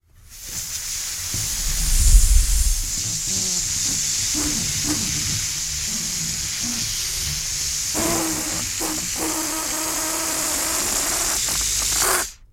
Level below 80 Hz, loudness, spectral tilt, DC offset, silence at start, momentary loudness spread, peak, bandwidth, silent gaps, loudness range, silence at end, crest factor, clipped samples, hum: -26 dBFS; -21 LUFS; -1.5 dB/octave; under 0.1%; 0.3 s; 5 LU; 0 dBFS; 16.5 kHz; none; 2 LU; 0.05 s; 22 dB; under 0.1%; none